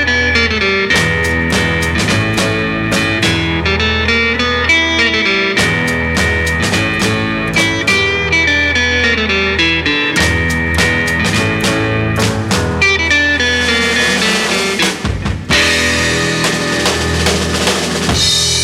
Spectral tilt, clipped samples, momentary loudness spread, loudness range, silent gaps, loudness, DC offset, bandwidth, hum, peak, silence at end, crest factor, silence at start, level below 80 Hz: -3.5 dB/octave; under 0.1%; 4 LU; 1 LU; none; -12 LUFS; under 0.1%; 16.5 kHz; none; 0 dBFS; 0 s; 14 dB; 0 s; -28 dBFS